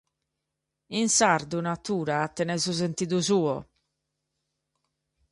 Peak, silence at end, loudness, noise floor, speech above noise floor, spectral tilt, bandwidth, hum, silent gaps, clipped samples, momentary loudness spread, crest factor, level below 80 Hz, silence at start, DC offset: -6 dBFS; 1.7 s; -26 LUFS; -84 dBFS; 58 dB; -3.5 dB/octave; 11.5 kHz; none; none; under 0.1%; 9 LU; 22 dB; -64 dBFS; 0.9 s; under 0.1%